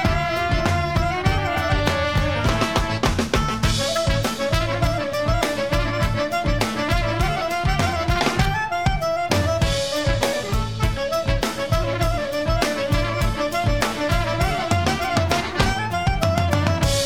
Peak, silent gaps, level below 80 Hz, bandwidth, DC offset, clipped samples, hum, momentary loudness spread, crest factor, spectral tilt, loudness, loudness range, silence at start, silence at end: -4 dBFS; none; -28 dBFS; 17.5 kHz; 0.7%; under 0.1%; none; 2 LU; 16 dB; -5 dB/octave; -21 LUFS; 1 LU; 0 s; 0 s